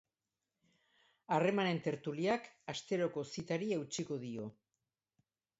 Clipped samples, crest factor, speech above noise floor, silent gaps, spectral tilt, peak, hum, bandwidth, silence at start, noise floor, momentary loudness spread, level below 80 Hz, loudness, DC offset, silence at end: under 0.1%; 20 dB; over 53 dB; none; -4.5 dB/octave; -18 dBFS; none; 8 kHz; 1.3 s; under -90 dBFS; 12 LU; -78 dBFS; -38 LUFS; under 0.1%; 1.1 s